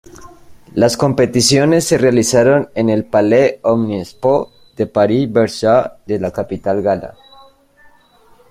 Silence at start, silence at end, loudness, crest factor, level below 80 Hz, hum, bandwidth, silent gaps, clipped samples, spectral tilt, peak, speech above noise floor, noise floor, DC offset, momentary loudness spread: 0.2 s; 1.4 s; -14 LUFS; 14 dB; -48 dBFS; none; 15.5 kHz; none; under 0.1%; -5 dB/octave; 0 dBFS; 35 dB; -49 dBFS; under 0.1%; 10 LU